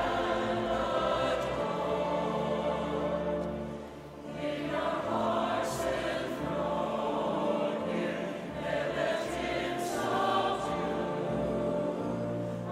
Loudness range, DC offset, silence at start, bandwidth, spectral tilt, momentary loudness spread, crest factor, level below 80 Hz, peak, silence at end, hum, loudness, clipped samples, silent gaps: 2 LU; under 0.1%; 0 s; 16 kHz; -5.5 dB/octave; 6 LU; 16 dB; -54 dBFS; -16 dBFS; 0 s; none; -32 LUFS; under 0.1%; none